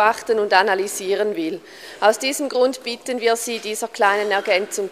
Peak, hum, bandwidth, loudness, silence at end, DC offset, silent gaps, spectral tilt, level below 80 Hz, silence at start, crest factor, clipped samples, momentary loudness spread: 0 dBFS; none; 15.5 kHz; -20 LUFS; 0 s; under 0.1%; none; -2 dB/octave; -70 dBFS; 0 s; 20 dB; under 0.1%; 10 LU